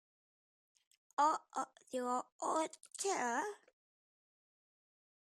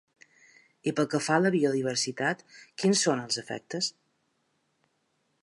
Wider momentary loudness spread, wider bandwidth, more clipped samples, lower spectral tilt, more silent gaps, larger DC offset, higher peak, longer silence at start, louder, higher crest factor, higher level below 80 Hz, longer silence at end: about the same, 10 LU vs 10 LU; first, 14 kHz vs 11.5 kHz; neither; second, -1.5 dB/octave vs -4 dB/octave; first, 2.32-2.39 s vs none; neither; second, -20 dBFS vs -10 dBFS; first, 1.2 s vs 0.85 s; second, -39 LUFS vs -28 LUFS; about the same, 22 dB vs 22 dB; second, under -90 dBFS vs -78 dBFS; first, 1.65 s vs 1.5 s